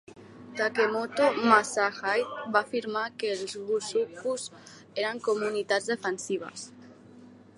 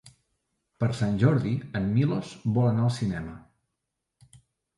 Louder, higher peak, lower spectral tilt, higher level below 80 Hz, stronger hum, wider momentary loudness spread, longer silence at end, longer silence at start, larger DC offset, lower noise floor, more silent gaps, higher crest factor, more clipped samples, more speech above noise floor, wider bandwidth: about the same, -28 LUFS vs -26 LUFS; about the same, -8 dBFS vs -10 dBFS; second, -3 dB/octave vs -8 dB/octave; second, -76 dBFS vs -54 dBFS; neither; first, 12 LU vs 8 LU; second, 0.25 s vs 1.4 s; about the same, 0.1 s vs 0.05 s; neither; second, -51 dBFS vs -83 dBFS; neither; about the same, 22 dB vs 18 dB; neither; second, 23 dB vs 58 dB; about the same, 11.5 kHz vs 11.5 kHz